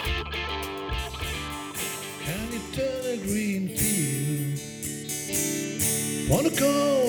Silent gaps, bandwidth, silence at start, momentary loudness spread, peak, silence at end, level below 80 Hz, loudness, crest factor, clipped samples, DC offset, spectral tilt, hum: none; 19.5 kHz; 0 s; 9 LU; -8 dBFS; 0 s; -42 dBFS; -27 LUFS; 20 dB; under 0.1%; under 0.1%; -4 dB/octave; none